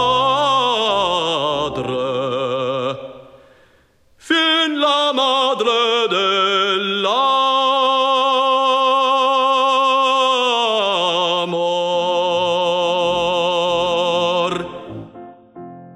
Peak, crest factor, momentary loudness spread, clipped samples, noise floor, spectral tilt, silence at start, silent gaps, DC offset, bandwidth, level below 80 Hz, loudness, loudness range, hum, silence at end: -4 dBFS; 12 dB; 6 LU; under 0.1%; -54 dBFS; -3.5 dB/octave; 0 s; none; under 0.1%; 11.5 kHz; -56 dBFS; -16 LUFS; 5 LU; none; 0.05 s